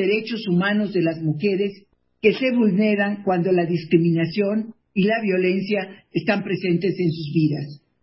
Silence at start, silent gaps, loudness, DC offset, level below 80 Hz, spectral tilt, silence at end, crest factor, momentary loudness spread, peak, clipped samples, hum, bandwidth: 0 s; none; -21 LUFS; under 0.1%; -66 dBFS; -11.5 dB/octave; 0.25 s; 18 dB; 7 LU; -4 dBFS; under 0.1%; none; 5.8 kHz